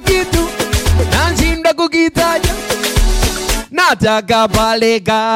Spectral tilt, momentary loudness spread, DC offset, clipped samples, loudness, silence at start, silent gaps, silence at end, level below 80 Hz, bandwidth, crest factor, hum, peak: -4 dB/octave; 4 LU; under 0.1%; under 0.1%; -13 LUFS; 0 s; none; 0 s; -20 dBFS; 17 kHz; 12 dB; none; 0 dBFS